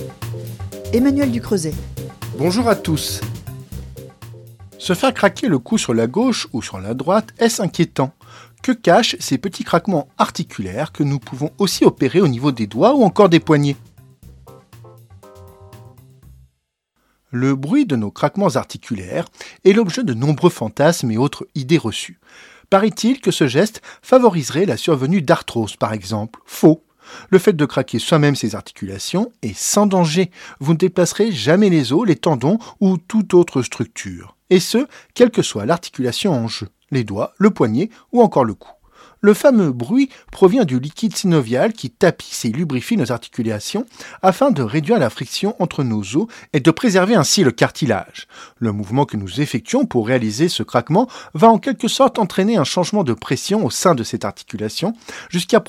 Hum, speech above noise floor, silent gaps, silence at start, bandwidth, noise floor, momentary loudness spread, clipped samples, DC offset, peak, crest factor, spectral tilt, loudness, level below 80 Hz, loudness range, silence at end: none; 53 dB; none; 0 s; 17 kHz; -70 dBFS; 12 LU; under 0.1%; under 0.1%; 0 dBFS; 18 dB; -5.5 dB/octave; -17 LUFS; -50 dBFS; 4 LU; 0.05 s